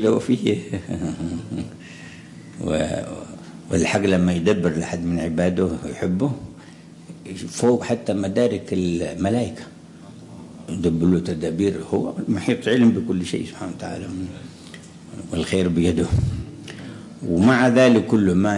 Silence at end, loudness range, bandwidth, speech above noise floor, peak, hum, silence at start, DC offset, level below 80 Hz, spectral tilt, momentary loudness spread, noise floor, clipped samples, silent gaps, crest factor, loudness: 0 s; 4 LU; 11.5 kHz; 22 dB; -4 dBFS; none; 0 s; under 0.1%; -46 dBFS; -6.5 dB/octave; 22 LU; -43 dBFS; under 0.1%; none; 18 dB; -21 LUFS